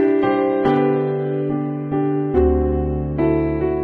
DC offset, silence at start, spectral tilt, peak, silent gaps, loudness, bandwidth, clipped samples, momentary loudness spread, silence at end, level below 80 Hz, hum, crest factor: under 0.1%; 0 s; -10.5 dB/octave; -4 dBFS; none; -19 LUFS; 4.6 kHz; under 0.1%; 5 LU; 0 s; -30 dBFS; none; 14 dB